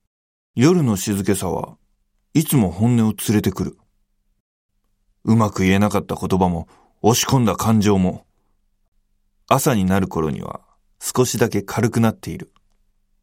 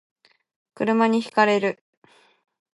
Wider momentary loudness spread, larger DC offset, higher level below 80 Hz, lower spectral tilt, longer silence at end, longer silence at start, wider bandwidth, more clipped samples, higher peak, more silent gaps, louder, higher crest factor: first, 13 LU vs 9 LU; neither; first, -50 dBFS vs -74 dBFS; about the same, -5.5 dB/octave vs -5.5 dB/octave; second, 0.8 s vs 1.05 s; second, 0.55 s vs 0.8 s; first, 16.5 kHz vs 11.5 kHz; neither; first, -2 dBFS vs -6 dBFS; first, 4.40-4.69 s, 8.88-8.92 s vs none; about the same, -19 LUFS vs -21 LUFS; about the same, 18 dB vs 18 dB